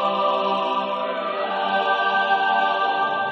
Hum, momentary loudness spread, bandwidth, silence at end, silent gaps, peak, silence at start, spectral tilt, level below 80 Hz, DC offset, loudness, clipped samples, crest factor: none; 6 LU; 7 kHz; 0 s; none; -8 dBFS; 0 s; -4.5 dB/octave; -78 dBFS; under 0.1%; -21 LUFS; under 0.1%; 12 dB